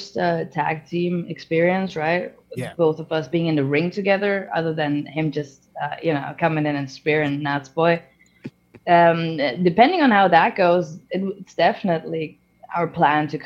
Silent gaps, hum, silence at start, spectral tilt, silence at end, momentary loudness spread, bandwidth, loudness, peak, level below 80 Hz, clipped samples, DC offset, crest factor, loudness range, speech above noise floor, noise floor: none; none; 0 s; -7 dB/octave; 0 s; 14 LU; 11.5 kHz; -21 LUFS; -2 dBFS; -64 dBFS; under 0.1%; under 0.1%; 20 dB; 5 LU; 21 dB; -41 dBFS